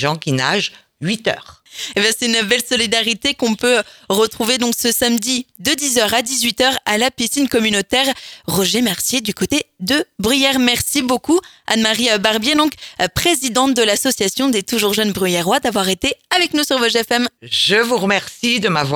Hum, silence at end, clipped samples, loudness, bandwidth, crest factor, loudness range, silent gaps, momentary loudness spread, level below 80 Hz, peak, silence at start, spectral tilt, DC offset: none; 0 s; under 0.1%; -16 LUFS; 20 kHz; 16 dB; 1 LU; none; 5 LU; -48 dBFS; 0 dBFS; 0 s; -2.5 dB/octave; under 0.1%